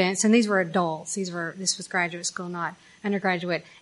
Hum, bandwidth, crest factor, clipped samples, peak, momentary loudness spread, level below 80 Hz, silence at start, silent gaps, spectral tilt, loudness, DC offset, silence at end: none; 11.5 kHz; 18 dB; under 0.1%; -8 dBFS; 11 LU; -76 dBFS; 0 s; none; -3.5 dB/octave; -26 LUFS; under 0.1%; 0.15 s